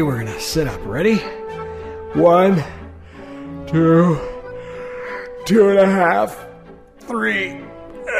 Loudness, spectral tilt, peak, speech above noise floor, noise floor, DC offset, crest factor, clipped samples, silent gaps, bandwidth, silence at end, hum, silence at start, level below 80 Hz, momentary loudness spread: -17 LUFS; -6.5 dB/octave; -2 dBFS; 26 dB; -42 dBFS; under 0.1%; 16 dB; under 0.1%; none; 15.5 kHz; 0 s; none; 0 s; -42 dBFS; 21 LU